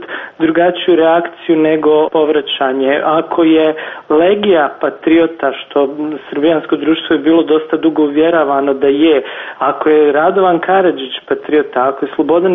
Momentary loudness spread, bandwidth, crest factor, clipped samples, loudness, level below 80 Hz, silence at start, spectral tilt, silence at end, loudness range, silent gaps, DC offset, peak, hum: 7 LU; 3.9 kHz; 10 dB; under 0.1%; -12 LUFS; -54 dBFS; 0 s; -3 dB/octave; 0 s; 2 LU; none; under 0.1%; 0 dBFS; none